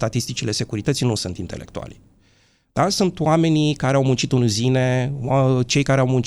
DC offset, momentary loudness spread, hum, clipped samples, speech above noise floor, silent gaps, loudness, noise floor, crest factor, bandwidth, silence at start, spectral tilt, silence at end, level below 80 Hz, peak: under 0.1%; 13 LU; none; under 0.1%; 39 dB; none; -20 LUFS; -59 dBFS; 16 dB; 13 kHz; 0 s; -5.5 dB/octave; 0 s; -46 dBFS; -4 dBFS